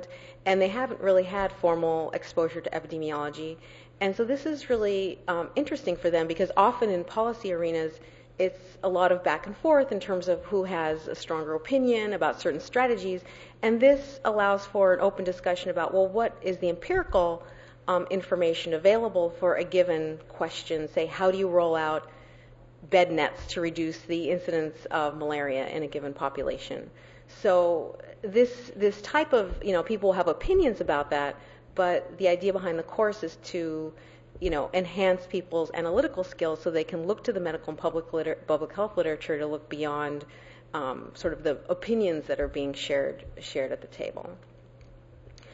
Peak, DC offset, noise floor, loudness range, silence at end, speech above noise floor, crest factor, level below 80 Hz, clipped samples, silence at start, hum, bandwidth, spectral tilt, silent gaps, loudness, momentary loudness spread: -8 dBFS; under 0.1%; -51 dBFS; 5 LU; 0 s; 24 dB; 20 dB; -50 dBFS; under 0.1%; 0 s; none; 8 kHz; -5.5 dB/octave; none; -28 LUFS; 10 LU